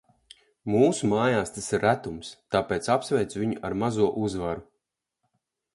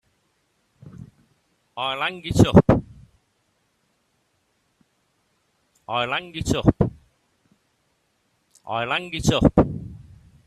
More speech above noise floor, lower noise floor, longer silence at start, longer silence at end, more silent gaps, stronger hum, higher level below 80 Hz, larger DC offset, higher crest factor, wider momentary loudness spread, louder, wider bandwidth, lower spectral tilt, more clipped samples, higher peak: first, 56 dB vs 50 dB; first, -81 dBFS vs -69 dBFS; second, 0.65 s vs 0.85 s; first, 1.1 s vs 0.45 s; neither; neither; second, -54 dBFS vs -40 dBFS; neither; about the same, 20 dB vs 24 dB; second, 11 LU vs 25 LU; second, -26 LUFS vs -21 LUFS; second, 11.5 kHz vs 14.5 kHz; about the same, -5.5 dB/octave vs -6 dB/octave; neither; second, -8 dBFS vs 0 dBFS